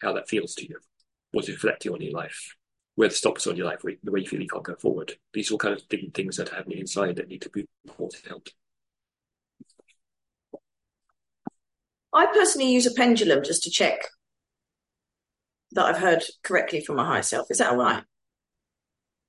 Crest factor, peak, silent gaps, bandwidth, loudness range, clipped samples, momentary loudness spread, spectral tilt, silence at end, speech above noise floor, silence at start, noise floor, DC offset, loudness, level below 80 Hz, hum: 22 dB; -6 dBFS; 7.80-7.84 s; 11.5 kHz; 12 LU; under 0.1%; 17 LU; -3 dB/octave; 1.25 s; 65 dB; 0 s; -90 dBFS; under 0.1%; -25 LUFS; -72 dBFS; none